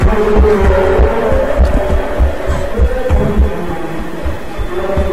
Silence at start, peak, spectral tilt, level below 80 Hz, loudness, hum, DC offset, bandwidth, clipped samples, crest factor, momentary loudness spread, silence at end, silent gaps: 0 s; -2 dBFS; -7.5 dB/octave; -14 dBFS; -14 LUFS; none; 9%; 12.5 kHz; under 0.1%; 10 dB; 11 LU; 0 s; none